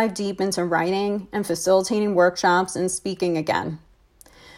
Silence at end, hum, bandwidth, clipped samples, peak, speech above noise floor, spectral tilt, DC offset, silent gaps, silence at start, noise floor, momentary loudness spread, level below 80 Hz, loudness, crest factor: 0.05 s; none; 16 kHz; under 0.1%; -6 dBFS; 31 dB; -4.5 dB/octave; under 0.1%; none; 0 s; -53 dBFS; 7 LU; -58 dBFS; -22 LUFS; 16 dB